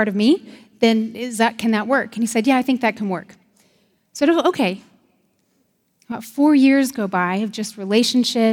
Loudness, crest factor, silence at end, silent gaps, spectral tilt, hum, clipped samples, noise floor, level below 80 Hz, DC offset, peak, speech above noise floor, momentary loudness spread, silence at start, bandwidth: -19 LUFS; 18 dB; 0 s; none; -4.5 dB/octave; none; under 0.1%; -65 dBFS; -70 dBFS; under 0.1%; -2 dBFS; 47 dB; 11 LU; 0 s; 17 kHz